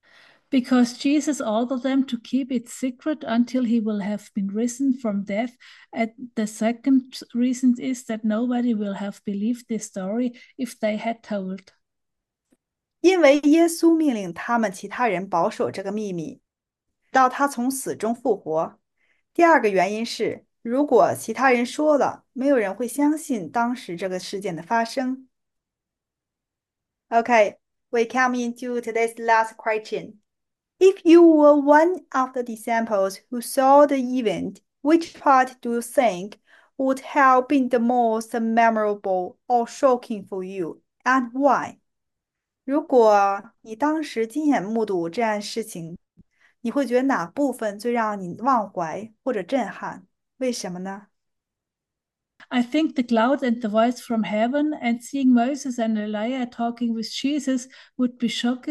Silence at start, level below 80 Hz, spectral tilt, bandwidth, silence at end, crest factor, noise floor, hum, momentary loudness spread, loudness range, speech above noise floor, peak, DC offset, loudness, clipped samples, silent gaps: 0.5 s; -72 dBFS; -5 dB/octave; 12.5 kHz; 0 s; 18 dB; -86 dBFS; none; 13 LU; 7 LU; 65 dB; -4 dBFS; under 0.1%; -22 LUFS; under 0.1%; none